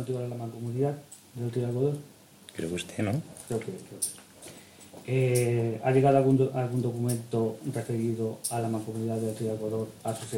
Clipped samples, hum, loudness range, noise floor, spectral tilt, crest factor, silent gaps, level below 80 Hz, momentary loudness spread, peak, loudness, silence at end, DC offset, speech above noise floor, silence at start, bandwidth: under 0.1%; none; 7 LU; -49 dBFS; -6.5 dB/octave; 20 dB; none; -66 dBFS; 16 LU; -10 dBFS; -29 LUFS; 0 s; under 0.1%; 21 dB; 0 s; 16.5 kHz